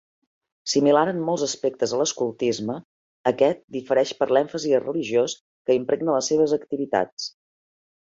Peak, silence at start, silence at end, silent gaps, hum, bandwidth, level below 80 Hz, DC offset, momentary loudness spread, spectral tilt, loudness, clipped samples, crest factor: -4 dBFS; 0.65 s; 0.9 s; 2.85-3.24 s, 3.64-3.68 s, 5.40-5.65 s, 7.12-7.17 s; none; 8 kHz; -68 dBFS; under 0.1%; 10 LU; -4 dB/octave; -23 LUFS; under 0.1%; 20 dB